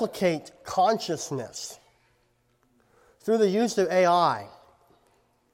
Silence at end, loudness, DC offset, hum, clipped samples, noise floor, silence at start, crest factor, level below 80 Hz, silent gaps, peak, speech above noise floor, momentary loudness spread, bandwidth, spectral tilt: 1.05 s; -25 LUFS; under 0.1%; none; under 0.1%; -68 dBFS; 0 s; 18 dB; -70 dBFS; none; -8 dBFS; 43 dB; 15 LU; 16 kHz; -4.5 dB/octave